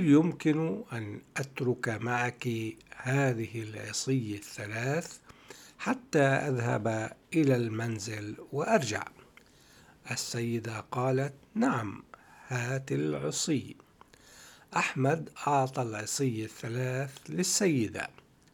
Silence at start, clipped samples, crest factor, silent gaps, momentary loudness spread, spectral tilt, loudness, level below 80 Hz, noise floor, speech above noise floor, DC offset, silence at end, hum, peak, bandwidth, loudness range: 0 s; under 0.1%; 20 dB; none; 12 LU; -5 dB/octave; -31 LUFS; -70 dBFS; -58 dBFS; 28 dB; under 0.1%; 0.45 s; none; -12 dBFS; 18 kHz; 3 LU